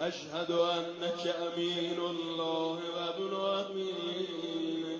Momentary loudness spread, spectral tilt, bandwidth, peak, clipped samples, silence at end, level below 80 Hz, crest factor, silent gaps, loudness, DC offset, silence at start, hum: 5 LU; -4.5 dB/octave; 7.6 kHz; -18 dBFS; under 0.1%; 0 s; -80 dBFS; 16 dB; none; -34 LUFS; under 0.1%; 0 s; none